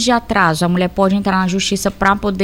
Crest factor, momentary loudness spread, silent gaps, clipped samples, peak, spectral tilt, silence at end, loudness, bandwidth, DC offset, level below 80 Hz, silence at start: 14 dB; 3 LU; none; under 0.1%; 0 dBFS; -4.5 dB/octave; 0 s; -15 LUFS; 16.5 kHz; under 0.1%; -38 dBFS; 0 s